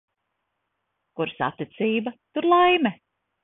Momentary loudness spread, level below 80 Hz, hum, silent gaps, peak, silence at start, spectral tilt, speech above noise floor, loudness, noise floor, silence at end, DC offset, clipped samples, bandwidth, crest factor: 13 LU; -68 dBFS; none; none; -8 dBFS; 1.2 s; -9.5 dB/octave; 56 dB; -23 LUFS; -78 dBFS; 0.5 s; under 0.1%; under 0.1%; 3.9 kHz; 18 dB